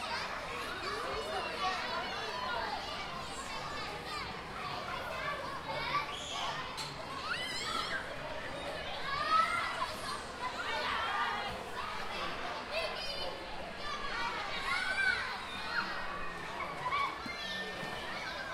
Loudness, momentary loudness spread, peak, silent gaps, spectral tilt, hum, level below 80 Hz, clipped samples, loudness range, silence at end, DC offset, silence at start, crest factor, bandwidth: -37 LUFS; 7 LU; -18 dBFS; none; -2.5 dB/octave; none; -56 dBFS; under 0.1%; 4 LU; 0 s; under 0.1%; 0 s; 20 dB; 16.5 kHz